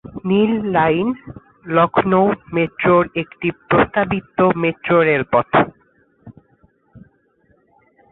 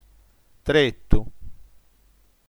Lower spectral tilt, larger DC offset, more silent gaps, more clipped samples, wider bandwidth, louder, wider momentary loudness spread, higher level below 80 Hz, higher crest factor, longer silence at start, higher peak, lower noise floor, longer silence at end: first, -11.5 dB/octave vs -6 dB/octave; neither; neither; neither; second, 4.1 kHz vs 10.5 kHz; first, -17 LUFS vs -23 LUFS; second, 8 LU vs 14 LU; second, -48 dBFS vs -32 dBFS; second, 16 dB vs 24 dB; second, 0.15 s vs 0.65 s; about the same, -2 dBFS vs 0 dBFS; about the same, -59 dBFS vs -59 dBFS; first, 1.15 s vs 1 s